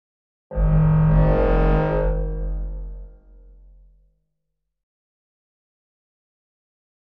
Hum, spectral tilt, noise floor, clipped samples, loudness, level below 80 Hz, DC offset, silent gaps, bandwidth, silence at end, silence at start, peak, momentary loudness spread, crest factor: none; -11.5 dB/octave; -79 dBFS; under 0.1%; -20 LUFS; -26 dBFS; under 0.1%; none; 3.9 kHz; 3.9 s; 0.5 s; -6 dBFS; 17 LU; 16 dB